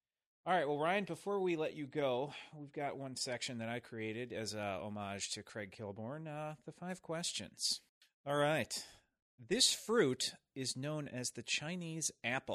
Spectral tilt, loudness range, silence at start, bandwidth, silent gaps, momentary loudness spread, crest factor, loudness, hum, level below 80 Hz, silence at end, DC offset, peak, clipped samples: -3 dB/octave; 7 LU; 0.45 s; 15 kHz; 7.89-8.01 s, 8.14-8.24 s, 9.22-9.38 s; 13 LU; 22 dB; -38 LUFS; none; -78 dBFS; 0 s; under 0.1%; -18 dBFS; under 0.1%